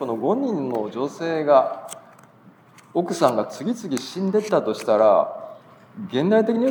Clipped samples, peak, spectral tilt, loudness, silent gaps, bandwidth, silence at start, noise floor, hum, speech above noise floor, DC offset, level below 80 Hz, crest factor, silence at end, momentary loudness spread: under 0.1%; -2 dBFS; -6 dB/octave; -22 LUFS; none; 20 kHz; 0 s; -51 dBFS; none; 30 dB; under 0.1%; -80 dBFS; 20 dB; 0 s; 14 LU